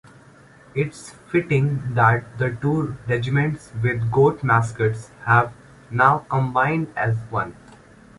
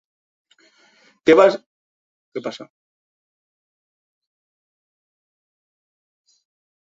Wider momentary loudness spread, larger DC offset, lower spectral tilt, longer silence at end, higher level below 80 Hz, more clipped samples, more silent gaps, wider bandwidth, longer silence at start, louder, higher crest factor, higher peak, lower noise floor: second, 10 LU vs 21 LU; neither; first, -7.5 dB/octave vs -5 dB/octave; second, 0.65 s vs 4.25 s; first, -50 dBFS vs -68 dBFS; neither; second, none vs 1.66-2.32 s; first, 11.5 kHz vs 7.8 kHz; second, 0.75 s vs 1.25 s; second, -21 LUFS vs -17 LUFS; about the same, 20 dB vs 24 dB; about the same, -2 dBFS vs -2 dBFS; second, -49 dBFS vs -57 dBFS